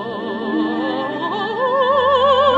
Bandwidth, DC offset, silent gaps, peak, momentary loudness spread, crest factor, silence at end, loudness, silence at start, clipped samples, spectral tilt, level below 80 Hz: 7.6 kHz; under 0.1%; none; -2 dBFS; 8 LU; 14 dB; 0 s; -18 LUFS; 0 s; under 0.1%; -6 dB/octave; -56 dBFS